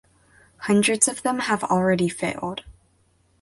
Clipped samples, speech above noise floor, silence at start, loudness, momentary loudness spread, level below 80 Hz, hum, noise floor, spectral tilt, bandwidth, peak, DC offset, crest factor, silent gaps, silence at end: under 0.1%; 41 dB; 0.6 s; -22 LUFS; 13 LU; -56 dBFS; none; -63 dBFS; -4 dB/octave; 12 kHz; -2 dBFS; under 0.1%; 22 dB; none; 0.7 s